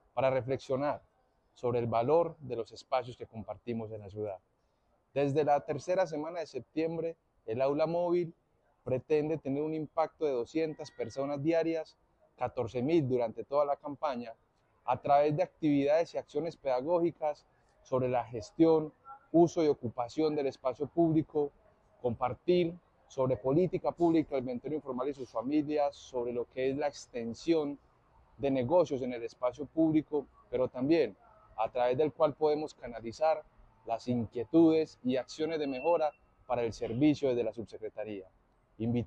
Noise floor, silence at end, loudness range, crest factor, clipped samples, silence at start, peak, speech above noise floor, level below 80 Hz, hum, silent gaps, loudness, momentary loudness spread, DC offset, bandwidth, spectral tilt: -73 dBFS; 0 s; 4 LU; 18 dB; under 0.1%; 0.15 s; -14 dBFS; 42 dB; -66 dBFS; none; none; -32 LUFS; 12 LU; under 0.1%; 8.4 kHz; -7.5 dB/octave